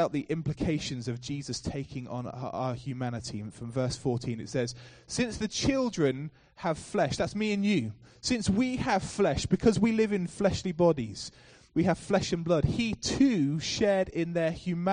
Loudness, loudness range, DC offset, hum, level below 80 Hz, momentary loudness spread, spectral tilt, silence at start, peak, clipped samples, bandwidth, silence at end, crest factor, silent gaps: -30 LUFS; 7 LU; under 0.1%; none; -50 dBFS; 11 LU; -5.5 dB/octave; 0 s; -10 dBFS; under 0.1%; 10 kHz; 0 s; 18 dB; none